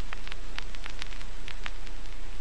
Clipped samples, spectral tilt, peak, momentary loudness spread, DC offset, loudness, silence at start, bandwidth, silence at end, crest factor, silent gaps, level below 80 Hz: under 0.1%; -3.5 dB/octave; -12 dBFS; 5 LU; 7%; -42 LUFS; 0 s; 11 kHz; 0 s; 24 dB; none; -40 dBFS